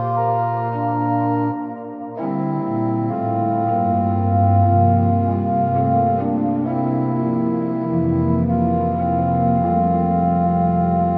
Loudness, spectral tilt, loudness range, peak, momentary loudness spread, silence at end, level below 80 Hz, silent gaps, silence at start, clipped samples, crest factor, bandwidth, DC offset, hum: -19 LUFS; -13 dB/octave; 4 LU; -4 dBFS; 6 LU; 0 s; -44 dBFS; none; 0 s; under 0.1%; 14 dB; 4.4 kHz; under 0.1%; none